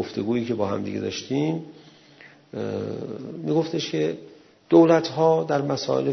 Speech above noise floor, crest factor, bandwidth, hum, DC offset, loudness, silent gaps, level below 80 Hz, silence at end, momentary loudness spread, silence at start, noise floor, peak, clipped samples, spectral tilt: 27 dB; 20 dB; 6.4 kHz; none; under 0.1%; -23 LUFS; none; -68 dBFS; 0 s; 15 LU; 0 s; -50 dBFS; -4 dBFS; under 0.1%; -6.5 dB/octave